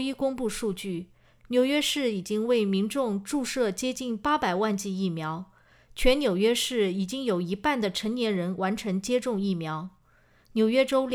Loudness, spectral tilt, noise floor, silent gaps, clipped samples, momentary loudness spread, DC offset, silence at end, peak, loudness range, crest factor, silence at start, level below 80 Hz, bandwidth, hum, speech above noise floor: -27 LUFS; -4.5 dB/octave; -61 dBFS; none; under 0.1%; 10 LU; under 0.1%; 0 s; -10 dBFS; 2 LU; 18 dB; 0 s; -46 dBFS; 19.5 kHz; none; 35 dB